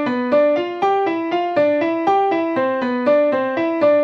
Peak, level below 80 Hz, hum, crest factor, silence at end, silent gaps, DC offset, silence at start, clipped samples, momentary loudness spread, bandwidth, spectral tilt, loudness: -6 dBFS; -68 dBFS; none; 12 dB; 0 s; none; under 0.1%; 0 s; under 0.1%; 4 LU; 6.6 kHz; -6.5 dB/octave; -18 LUFS